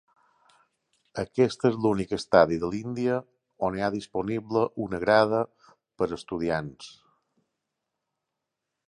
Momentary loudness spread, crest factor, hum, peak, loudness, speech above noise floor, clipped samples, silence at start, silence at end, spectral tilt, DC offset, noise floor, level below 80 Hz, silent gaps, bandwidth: 12 LU; 26 dB; none; -4 dBFS; -26 LUFS; 59 dB; under 0.1%; 1.15 s; 1.95 s; -6.5 dB/octave; under 0.1%; -85 dBFS; -58 dBFS; none; 11 kHz